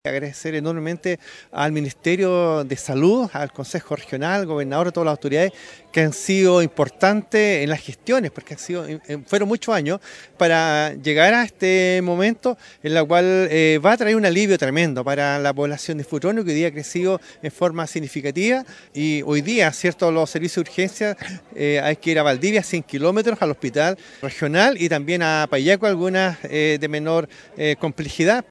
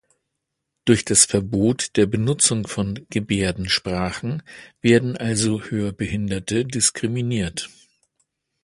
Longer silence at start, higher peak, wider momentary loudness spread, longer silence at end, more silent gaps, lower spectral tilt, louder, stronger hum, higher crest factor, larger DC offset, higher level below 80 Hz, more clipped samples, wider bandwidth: second, 0.05 s vs 0.85 s; about the same, 0 dBFS vs 0 dBFS; about the same, 11 LU vs 10 LU; second, 0.1 s vs 0.95 s; neither; about the same, -5 dB/octave vs -4 dB/octave; about the same, -20 LUFS vs -21 LUFS; neither; about the same, 20 dB vs 22 dB; neither; second, -60 dBFS vs -46 dBFS; neither; about the same, 11 kHz vs 11.5 kHz